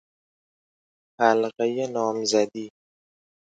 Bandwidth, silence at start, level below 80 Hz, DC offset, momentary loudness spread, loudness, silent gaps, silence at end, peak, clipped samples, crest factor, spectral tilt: 9.2 kHz; 1.2 s; -78 dBFS; under 0.1%; 11 LU; -24 LUFS; none; 0.75 s; -6 dBFS; under 0.1%; 22 dB; -3.5 dB/octave